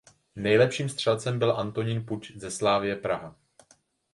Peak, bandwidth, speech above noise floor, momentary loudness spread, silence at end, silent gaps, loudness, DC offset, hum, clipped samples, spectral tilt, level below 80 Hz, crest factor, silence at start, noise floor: -8 dBFS; 11.5 kHz; 37 dB; 14 LU; 0.85 s; none; -27 LUFS; under 0.1%; none; under 0.1%; -5 dB/octave; -60 dBFS; 20 dB; 0.35 s; -64 dBFS